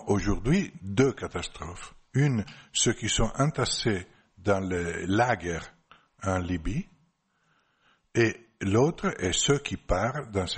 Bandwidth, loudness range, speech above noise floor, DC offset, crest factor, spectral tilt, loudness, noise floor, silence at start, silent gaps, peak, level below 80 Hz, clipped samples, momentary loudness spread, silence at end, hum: 8.8 kHz; 4 LU; 44 dB; under 0.1%; 18 dB; -4.5 dB/octave; -28 LUFS; -71 dBFS; 0 s; none; -10 dBFS; -42 dBFS; under 0.1%; 11 LU; 0 s; none